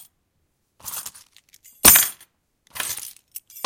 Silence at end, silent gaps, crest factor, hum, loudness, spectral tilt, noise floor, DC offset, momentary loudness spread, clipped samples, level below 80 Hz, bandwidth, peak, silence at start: 0.05 s; none; 24 dB; none; -15 LUFS; 0 dB/octave; -71 dBFS; under 0.1%; 27 LU; under 0.1%; -50 dBFS; 17 kHz; 0 dBFS; 0.85 s